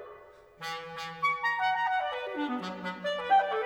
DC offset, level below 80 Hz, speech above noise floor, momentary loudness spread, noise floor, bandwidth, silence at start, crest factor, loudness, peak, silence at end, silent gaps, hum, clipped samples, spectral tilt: under 0.1%; -72 dBFS; 22 dB; 13 LU; -52 dBFS; 16 kHz; 0 s; 16 dB; -31 LUFS; -14 dBFS; 0 s; none; none; under 0.1%; -4 dB/octave